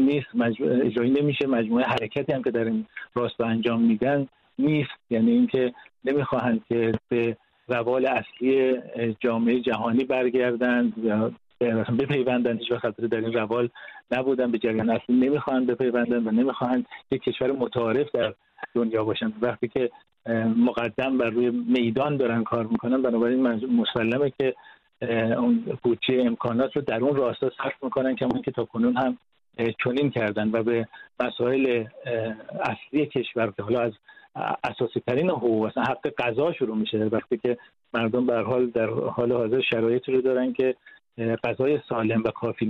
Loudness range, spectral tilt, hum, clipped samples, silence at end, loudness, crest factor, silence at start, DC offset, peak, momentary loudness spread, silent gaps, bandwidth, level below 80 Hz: 2 LU; -8.5 dB/octave; none; under 0.1%; 0 s; -25 LUFS; 16 dB; 0 s; under 0.1%; -10 dBFS; 7 LU; none; 5.2 kHz; -62 dBFS